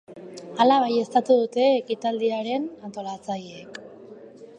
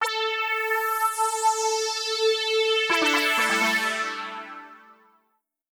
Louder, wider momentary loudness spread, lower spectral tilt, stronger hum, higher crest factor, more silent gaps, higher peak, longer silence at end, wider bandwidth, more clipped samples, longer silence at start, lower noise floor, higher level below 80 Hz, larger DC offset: about the same, -23 LUFS vs -23 LUFS; first, 21 LU vs 11 LU; first, -5 dB/octave vs -0.5 dB/octave; neither; about the same, 20 dB vs 16 dB; neither; first, -6 dBFS vs -10 dBFS; second, 0.15 s vs 0.8 s; second, 9.8 kHz vs over 20 kHz; neither; about the same, 0.1 s vs 0 s; second, -44 dBFS vs -73 dBFS; first, -74 dBFS vs -84 dBFS; neither